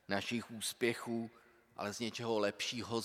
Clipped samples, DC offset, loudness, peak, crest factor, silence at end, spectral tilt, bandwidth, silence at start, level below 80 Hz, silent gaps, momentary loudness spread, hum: under 0.1%; under 0.1%; -38 LUFS; -18 dBFS; 22 dB; 0 s; -3.5 dB/octave; 16.5 kHz; 0.1 s; -80 dBFS; none; 8 LU; none